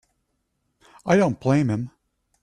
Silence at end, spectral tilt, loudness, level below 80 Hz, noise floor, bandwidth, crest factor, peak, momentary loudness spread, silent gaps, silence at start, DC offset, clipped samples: 0.55 s; -7.5 dB/octave; -22 LUFS; -58 dBFS; -74 dBFS; 11 kHz; 20 dB; -4 dBFS; 15 LU; none; 1.05 s; under 0.1%; under 0.1%